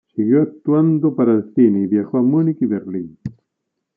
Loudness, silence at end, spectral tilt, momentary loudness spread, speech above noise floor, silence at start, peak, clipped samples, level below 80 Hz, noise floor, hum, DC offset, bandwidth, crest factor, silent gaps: -17 LUFS; 0.65 s; -13 dB/octave; 13 LU; 61 dB; 0.15 s; -2 dBFS; under 0.1%; -64 dBFS; -77 dBFS; none; under 0.1%; 2.7 kHz; 14 dB; none